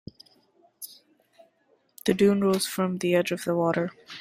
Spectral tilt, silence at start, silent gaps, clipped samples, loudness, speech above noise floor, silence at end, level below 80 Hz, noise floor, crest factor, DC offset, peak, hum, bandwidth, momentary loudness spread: -5.5 dB/octave; 0.8 s; none; under 0.1%; -25 LUFS; 43 dB; 0 s; -66 dBFS; -67 dBFS; 18 dB; under 0.1%; -8 dBFS; none; 16 kHz; 21 LU